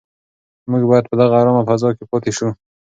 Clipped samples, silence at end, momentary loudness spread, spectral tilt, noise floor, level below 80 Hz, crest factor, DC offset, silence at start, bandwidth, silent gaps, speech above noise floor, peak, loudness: under 0.1%; 0.35 s; 10 LU; -7 dB/octave; under -90 dBFS; -54 dBFS; 16 dB; under 0.1%; 0.65 s; 9 kHz; none; over 75 dB; 0 dBFS; -16 LUFS